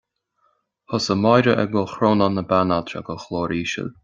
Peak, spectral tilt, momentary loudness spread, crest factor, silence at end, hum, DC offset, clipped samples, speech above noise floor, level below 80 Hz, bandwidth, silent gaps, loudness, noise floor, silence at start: -2 dBFS; -6 dB/octave; 12 LU; 20 dB; 0.15 s; none; under 0.1%; under 0.1%; 47 dB; -56 dBFS; 7.6 kHz; none; -20 LUFS; -67 dBFS; 0.9 s